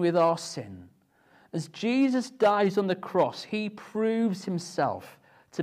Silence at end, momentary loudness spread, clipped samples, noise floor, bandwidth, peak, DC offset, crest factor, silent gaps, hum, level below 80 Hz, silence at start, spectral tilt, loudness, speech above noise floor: 0 s; 13 LU; under 0.1%; -62 dBFS; 14.5 kHz; -12 dBFS; under 0.1%; 16 dB; none; none; -76 dBFS; 0 s; -6 dB/octave; -27 LUFS; 35 dB